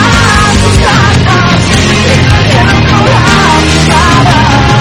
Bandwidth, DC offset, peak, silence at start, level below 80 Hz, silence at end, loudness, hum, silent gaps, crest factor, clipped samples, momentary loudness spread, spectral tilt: 14.5 kHz; under 0.1%; 0 dBFS; 0 s; -16 dBFS; 0 s; -5 LUFS; none; none; 6 dB; 4%; 1 LU; -4.5 dB/octave